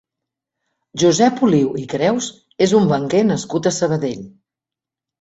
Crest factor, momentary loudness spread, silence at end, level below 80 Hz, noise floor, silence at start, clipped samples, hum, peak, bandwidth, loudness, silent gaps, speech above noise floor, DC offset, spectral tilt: 16 dB; 10 LU; 0.9 s; -56 dBFS; -87 dBFS; 0.95 s; under 0.1%; none; -2 dBFS; 8.2 kHz; -17 LUFS; none; 71 dB; under 0.1%; -5.5 dB/octave